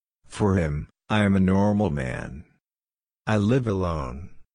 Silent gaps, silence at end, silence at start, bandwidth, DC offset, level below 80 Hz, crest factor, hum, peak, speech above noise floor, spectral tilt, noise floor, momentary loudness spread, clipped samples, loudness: none; 0.15 s; 0.3 s; 10.5 kHz; under 0.1%; -42 dBFS; 18 dB; none; -6 dBFS; over 67 dB; -7.5 dB/octave; under -90 dBFS; 17 LU; under 0.1%; -24 LUFS